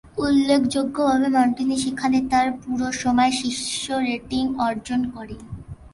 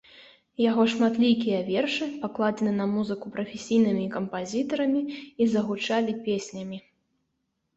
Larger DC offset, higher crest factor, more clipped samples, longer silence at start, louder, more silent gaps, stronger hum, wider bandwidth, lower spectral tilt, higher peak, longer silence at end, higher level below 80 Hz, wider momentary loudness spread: neither; about the same, 16 dB vs 16 dB; neither; about the same, 0.05 s vs 0.15 s; first, -21 LUFS vs -26 LUFS; neither; neither; first, 11.5 kHz vs 8 kHz; second, -4 dB/octave vs -5.5 dB/octave; first, -6 dBFS vs -10 dBFS; second, 0.05 s vs 0.95 s; first, -48 dBFS vs -68 dBFS; about the same, 9 LU vs 11 LU